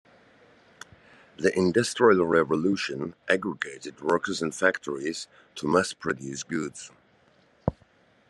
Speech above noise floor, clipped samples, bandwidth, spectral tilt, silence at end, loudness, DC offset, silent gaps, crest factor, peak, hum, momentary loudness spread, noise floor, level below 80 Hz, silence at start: 36 dB; under 0.1%; 12 kHz; -4.5 dB/octave; 0.6 s; -26 LUFS; under 0.1%; none; 22 dB; -6 dBFS; none; 13 LU; -62 dBFS; -58 dBFS; 1.4 s